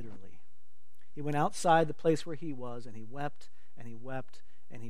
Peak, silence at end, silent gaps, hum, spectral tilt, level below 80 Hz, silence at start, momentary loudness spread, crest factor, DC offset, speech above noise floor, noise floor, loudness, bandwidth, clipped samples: -12 dBFS; 0 s; none; none; -5.5 dB/octave; -70 dBFS; 0 s; 23 LU; 24 dB; 2%; 41 dB; -74 dBFS; -33 LUFS; 15 kHz; under 0.1%